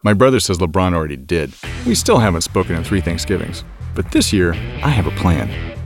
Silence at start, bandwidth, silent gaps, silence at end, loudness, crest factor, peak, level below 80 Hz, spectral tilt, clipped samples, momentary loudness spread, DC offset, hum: 0.05 s; 17 kHz; none; 0 s; -17 LUFS; 16 dB; 0 dBFS; -30 dBFS; -5 dB/octave; under 0.1%; 11 LU; under 0.1%; none